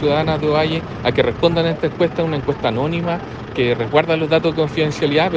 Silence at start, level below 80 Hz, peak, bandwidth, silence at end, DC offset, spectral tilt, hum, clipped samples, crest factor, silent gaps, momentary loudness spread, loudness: 0 s; -42 dBFS; 0 dBFS; 7.8 kHz; 0 s; under 0.1%; -7 dB/octave; none; under 0.1%; 18 dB; none; 4 LU; -18 LUFS